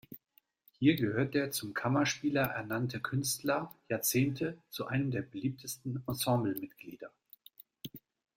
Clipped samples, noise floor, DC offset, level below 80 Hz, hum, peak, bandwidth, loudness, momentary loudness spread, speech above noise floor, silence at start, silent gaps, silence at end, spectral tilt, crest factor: under 0.1%; -71 dBFS; under 0.1%; -68 dBFS; none; -14 dBFS; 16.5 kHz; -33 LUFS; 19 LU; 38 dB; 0.1 s; none; 0.4 s; -5 dB/octave; 20 dB